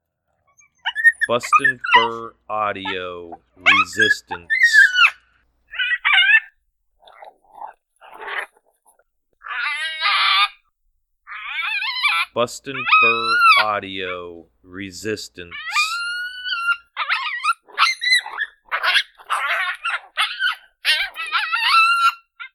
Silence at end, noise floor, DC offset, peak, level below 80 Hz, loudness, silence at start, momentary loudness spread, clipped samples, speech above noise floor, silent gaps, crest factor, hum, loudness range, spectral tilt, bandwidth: 0.1 s; -68 dBFS; under 0.1%; 0 dBFS; -64 dBFS; -17 LUFS; 0.85 s; 16 LU; under 0.1%; 48 dB; none; 20 dB; none; 7 LU; -1 dB/octave; 18.5 kHz